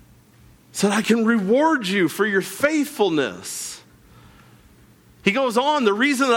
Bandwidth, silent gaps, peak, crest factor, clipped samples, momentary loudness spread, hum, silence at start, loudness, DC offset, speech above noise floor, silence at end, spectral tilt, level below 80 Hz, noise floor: 18.5 kHz; none; -6 dBFS; 16 dB; under 0.1%; 11 LU; none; 0.75 s; -20 LUFS; under 0.1%; 32 dB; 0 s; -4 dB/octave; -60 dBFS; -51 dBFS